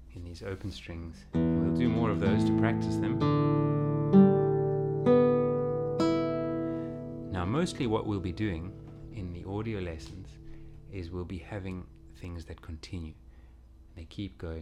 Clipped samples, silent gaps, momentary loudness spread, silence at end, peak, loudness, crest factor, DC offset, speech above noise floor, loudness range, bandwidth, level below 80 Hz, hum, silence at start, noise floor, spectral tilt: under 0.1%; none; 20 LU; 0 s; -10 dBFS; -29 LUFS; 20 dB; under 0.1%; 22 dB; 16 LU; 11 kHz; -50 dBFS; none; 0 s; -53 dBFS; -8 dB/octave